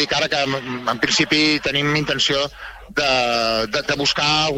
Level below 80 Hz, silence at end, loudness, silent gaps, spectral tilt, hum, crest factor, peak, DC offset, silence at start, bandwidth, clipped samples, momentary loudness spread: -46 dBFS; 0 s; -18 LUFS; none; -3 dB/octave; none; 16 dB; -4 dBFS; under 0.1%; 0 s; 16 kHz; under 0.1%; 8 LU